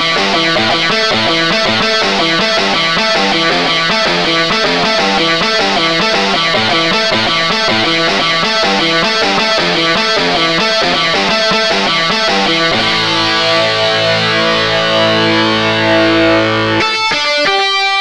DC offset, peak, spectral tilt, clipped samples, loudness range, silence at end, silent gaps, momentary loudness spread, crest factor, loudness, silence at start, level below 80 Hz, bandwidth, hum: 1%; 0 dBFS; -3 dB/octave; under 0.1%; 0 LU; 0 s; none; 1 LU; 12 dB; -10 LUFS; 0 s; -42 dBFS; 13 kHz; none